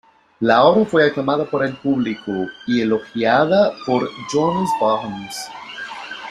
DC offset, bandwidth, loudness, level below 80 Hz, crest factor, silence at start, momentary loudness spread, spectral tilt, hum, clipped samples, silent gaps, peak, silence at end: under 0.1%; 13.5 kHz; -18 LUFS; -58 dBFS; 16 dB; 0.4 s; 16 LU; -5.5 dB/octave; none; under 0.1%; none; -2 dBFS; 0 s